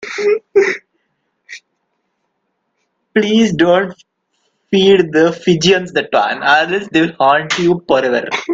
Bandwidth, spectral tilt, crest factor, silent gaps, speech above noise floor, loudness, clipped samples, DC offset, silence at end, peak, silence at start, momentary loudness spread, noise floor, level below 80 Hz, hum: 7.8 kHz; -5 dB/octave; 14 dB; none; 56 dB; -13 LUFS; under 0.1%; under 0.1%; 0 s; 0 dBFS; 0 s; 8 LU; -69 dBFS; -54 dBFS; none